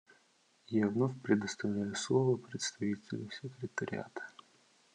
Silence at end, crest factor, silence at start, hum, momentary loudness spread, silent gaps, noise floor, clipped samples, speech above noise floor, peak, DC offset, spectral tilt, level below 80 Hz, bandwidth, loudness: 0.65 s; 20 dB; 0.7 s; none; 13 LU; none; -70 dBFS; under 0.1%; 36 dB; -16 dBFS; under 0.1%; -5.5 dB/octave; -82 dBFS; 10.5 kHz; -35 LUFS